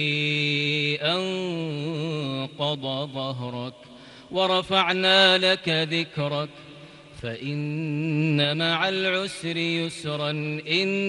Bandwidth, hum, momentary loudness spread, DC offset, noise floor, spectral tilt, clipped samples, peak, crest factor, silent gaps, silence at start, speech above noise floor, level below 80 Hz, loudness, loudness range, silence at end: 11.5 kHz; none; 11 LU; under 0.1%; -45 dBFS; -5 dB/octave; under 0.1%; -6 dBFS; 20 dB; none; 0 s; 21 dB; -64 dBFS; -24 LUFS; 6 LU; 0 s